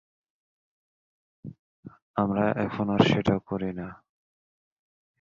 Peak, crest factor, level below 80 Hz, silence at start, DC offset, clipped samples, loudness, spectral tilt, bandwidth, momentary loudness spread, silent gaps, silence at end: -6 dBFS; 24 dB; -56 dBFS; 1.45 s; under 0.1%; under 0.1%; -26 LUFS; -7.5 dB/octave; 7.4 kHz; 24 LU; 1.59-1.83 s, 2.02-2.14 s; 1.25 s